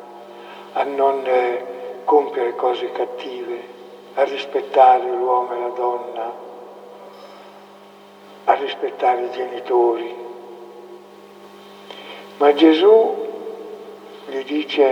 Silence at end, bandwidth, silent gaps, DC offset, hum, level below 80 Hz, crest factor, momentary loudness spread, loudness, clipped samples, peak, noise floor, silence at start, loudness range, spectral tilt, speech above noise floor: 0 s; 9 kHz; none; under 0.1%; 50 Hz at -55 dBFS; -86 dBFS; 20 dB; 25 LU; -19 LUFS; under 0.1%; 0 dBFS; -44 dBFS; 0 s; 7 LU; -5 dB/octave; 27 dB